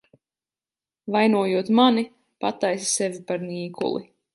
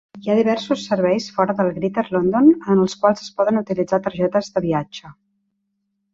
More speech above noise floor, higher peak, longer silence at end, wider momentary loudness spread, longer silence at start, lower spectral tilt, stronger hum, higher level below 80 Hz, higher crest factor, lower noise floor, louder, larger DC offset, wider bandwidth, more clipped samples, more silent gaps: first, over 68 dB vs 54 dB; about the same, -4 dBFS vs -2 dBFS; second, 0.3 s vs 1 s; first, 13 LU vs 8 LU; first, 1.05 s vs 0.15 s; second, -4 dB/octave vs -6.5 dB/octave; neither; second, -74 dBFS vs -58 dBFS; about the same, 20 dB vs 18 dB; first, under -90 dBFS vs -73 dBFS; second, -23 LUFS vs -19 LUFS; neither; first, 11.5 kHz vs 7.8 kHz; neither; neither